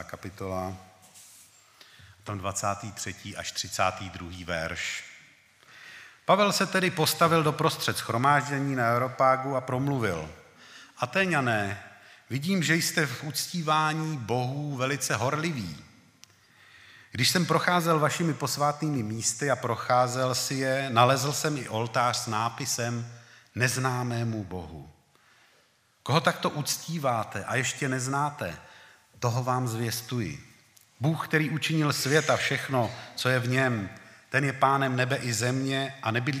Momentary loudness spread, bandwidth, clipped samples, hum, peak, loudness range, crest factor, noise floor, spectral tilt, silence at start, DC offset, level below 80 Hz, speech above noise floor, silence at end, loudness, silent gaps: 13 LU; 15.5 kHz; under 0.1%; none; -6 dBFS; 7 LU; 24 dB; -65 dBFS; -4 dB/octave; 0 s; under 0.1%; -62 dBFS; 38 dB; 0 s; -27 LUFS; none